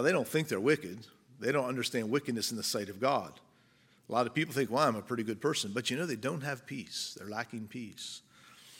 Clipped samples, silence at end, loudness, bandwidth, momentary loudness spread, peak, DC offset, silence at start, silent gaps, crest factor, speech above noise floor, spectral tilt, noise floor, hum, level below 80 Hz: under 0.1%; 0 s; -33 LUFS; 17 kHz; 12 LU; -12 dBFS; under 0.1%; 0 s; none; 22 dB; 32 dB; -4 dB/octave; -66 dBFS; none; -78 dBFS